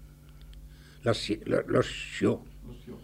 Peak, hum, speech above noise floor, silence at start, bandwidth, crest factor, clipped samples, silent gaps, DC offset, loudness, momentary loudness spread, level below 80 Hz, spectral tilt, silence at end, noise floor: -12 dBFS; none; 20 dB; 0 s; 16 kHz; 20 dB; under 0.1%; none; under 0.1%; -30 LUFS; 23 LU; -50 dBFS; -5.5 dB/octave; 0 s; -50 dBFS